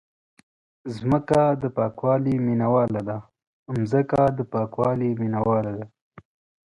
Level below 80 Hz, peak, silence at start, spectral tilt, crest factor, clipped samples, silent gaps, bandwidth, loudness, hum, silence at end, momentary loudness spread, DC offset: -54 dBFS; -8 dBFS; 0.85 s; -9 dB/octave; 16 dB; under 0.1%; 3.47-3.66 s, 6.01-6.11 s; 11 kHz; -23 LUFS; none; 0.45 s; 12 LU; under 0.1%